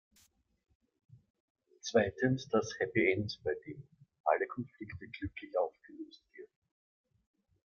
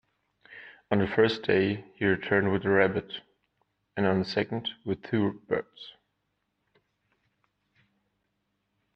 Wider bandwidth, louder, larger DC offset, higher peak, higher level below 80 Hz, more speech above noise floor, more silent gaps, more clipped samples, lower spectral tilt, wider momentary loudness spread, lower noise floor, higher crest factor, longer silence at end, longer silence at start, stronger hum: first, 7.8 kHz vs 6.6 kHz; second, -35 LUFS vs -27 LUFS; neither; second, -14 dBFS vs -8 dBFS; about the same, -68 dBFS vs -64 dBFS; second, 36 dB vs 52 dB; first, 4.20-4.24 s vs none; neither; second, -5.5 dB/octave vs -7.5 dB/octave; about the same, 20 LU vs 21 LU; second, -70 dBFS vs -79 dBFS; about the same, 24 dB vs 22 dB; second, 1.2 s vs 3.05 s; first, 1.85 s vs 0.5 s; second, none vs 50 Hz at -50 dBFS